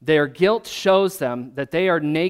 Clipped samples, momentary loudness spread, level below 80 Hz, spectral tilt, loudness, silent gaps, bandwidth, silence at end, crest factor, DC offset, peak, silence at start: under 0.1%; 8 LU; -58 dBFS; -5.5 dB/octave; -20 LUFS; none; 16 kHz; 0 s; 16 dB; under 0.1%; -4 dBFS; 0.05 s